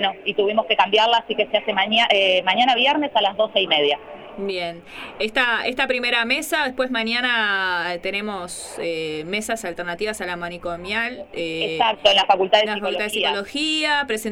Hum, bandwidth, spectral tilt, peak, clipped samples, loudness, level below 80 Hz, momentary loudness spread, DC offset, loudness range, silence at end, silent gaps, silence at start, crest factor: none; 17 kHz; -2.5 dB/octave; -2 dBFS; under 0.1%; -20 LUFS; -56 dBFS; 12 LU; under 0.1%; 8 LU; 0 s; none; 0 s; 20 dB